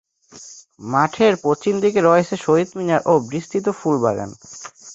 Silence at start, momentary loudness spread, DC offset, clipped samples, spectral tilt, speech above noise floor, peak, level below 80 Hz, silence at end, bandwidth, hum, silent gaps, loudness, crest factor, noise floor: 0.35 s; 20 LU; under 0.1%; under 0.1%; -6 dB/octave; 24 dB; -2 dBFS; -58 dBFS; 0 s; 8 kHz; none; none; -18 LUFS; 18 dB; -43 dBFS